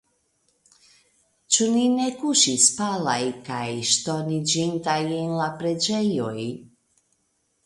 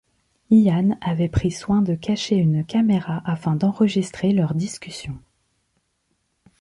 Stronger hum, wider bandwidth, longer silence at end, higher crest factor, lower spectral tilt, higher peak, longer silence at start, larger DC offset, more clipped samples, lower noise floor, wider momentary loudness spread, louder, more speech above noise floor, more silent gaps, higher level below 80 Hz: neither; about the same, 11.5 kHz vs 11.5 kHz; second, 1 s vs 1.45 s; first, 22 dB vs 16 dB; second, -3 dB/octave vs -7 dB/octave; about the same, -4 dBFS vs -6 dBFS; first, 1.5 s vs 0.5 s; neither; neither; about the same, -71 dBFS vs -71 dBFS; about the same, 11 LU vs 12 LU; about the same, -22 LUFS vs -21 LUFS; second, 47 dB vs 51 dB; neither; second, -66 dBFS vs -44 dBFS